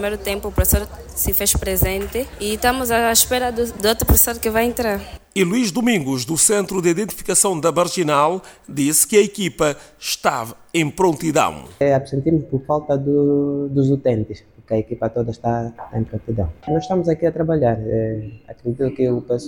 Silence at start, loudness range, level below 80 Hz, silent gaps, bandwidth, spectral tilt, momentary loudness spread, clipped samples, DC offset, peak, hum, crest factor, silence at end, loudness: 0 s; 4 LU; -34 dBFS; none; over 20 kHz; -4 dB/octave; 10 LU; under 0.1%; under 0.1%; -2 dBFS; none; 18 dB; 0 s; -19 LUFS